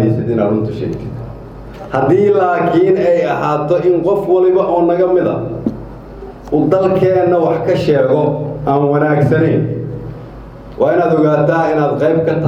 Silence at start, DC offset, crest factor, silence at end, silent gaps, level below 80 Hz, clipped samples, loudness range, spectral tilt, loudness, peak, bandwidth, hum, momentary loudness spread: 0 s; under 0.1%; 14 dB; 0 s; none; -40 dBFS; under 0.1%; 2 LU; -9 dB/octave; -13 LUFS; 0 dBFS; 7.6 kHz; none; 18 LU